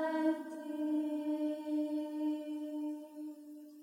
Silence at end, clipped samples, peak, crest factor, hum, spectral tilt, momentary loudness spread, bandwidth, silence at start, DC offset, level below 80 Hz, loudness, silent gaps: 0 s; under 0.1%; -22 dBFS; 16 dB; none; -4.5 dB/octave; 12 LU; 15.5 kHz; 0 s; under 0.1%; under -90 dBFS; -38 LUFS; none